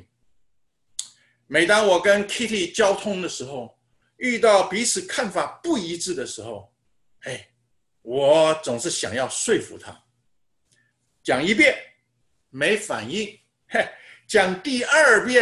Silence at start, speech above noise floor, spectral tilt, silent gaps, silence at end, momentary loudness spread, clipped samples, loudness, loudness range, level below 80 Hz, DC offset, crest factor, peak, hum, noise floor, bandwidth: 1 s; 51 dB; -2.5 dB/octave; none; 0 s; 18 LU; under 0.1%; -21 LUFS; 4 LU; -62 dBFS; under 0.1%; 20 dB; -4 dBFS; none; -72 dBFS; 12.5 kHz